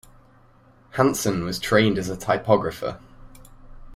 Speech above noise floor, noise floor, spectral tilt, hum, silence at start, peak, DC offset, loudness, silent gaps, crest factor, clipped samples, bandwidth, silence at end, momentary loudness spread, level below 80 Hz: 32 dB; -54 dBFS; -5 dB/octave; none; 0.95 s; -4 dBFS; under 0.1%; -22 LUFS; none; 22 dB; under 0.1%; 16 kHz; 0 s; 13 LU; -48 dBFS